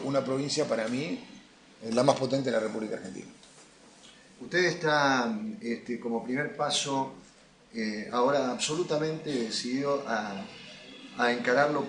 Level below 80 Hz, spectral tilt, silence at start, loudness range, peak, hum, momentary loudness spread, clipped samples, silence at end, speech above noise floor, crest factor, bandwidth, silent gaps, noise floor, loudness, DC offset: -72 dBFS; -4 dB/octave; 0 s; 3 LU; -8 dBFS; none; 17 LU; under 0.1%; 0 s; 28 dB; 22 dB; 10 kHz; none; -57 dBFS; -29 LUFS; under 0.1%